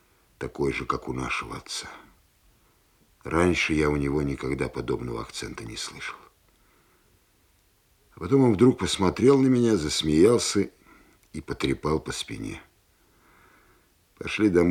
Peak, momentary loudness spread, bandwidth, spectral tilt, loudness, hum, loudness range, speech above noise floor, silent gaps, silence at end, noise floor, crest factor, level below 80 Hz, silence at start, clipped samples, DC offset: -6 dBFS; 18 LU; 15.5 kHz; -5 dB/octave; -25 LUFS; none; 11 LU; 40 dB; none; 0 s; -64 dBFS; 20 dB; -48 dBFS; 0.4 s; under 0.1%; under 0.1%